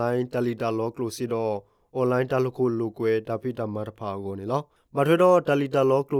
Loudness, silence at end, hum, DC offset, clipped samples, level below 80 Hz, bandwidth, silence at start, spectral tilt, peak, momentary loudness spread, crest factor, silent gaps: -25 LUFS; 0 s; none; under 0.1%; under 0.1%; -66 dBFS; 16.5 kHz; 0 s; -7 dB/octave; -8 dBFS; 13 LU; 16 dB; none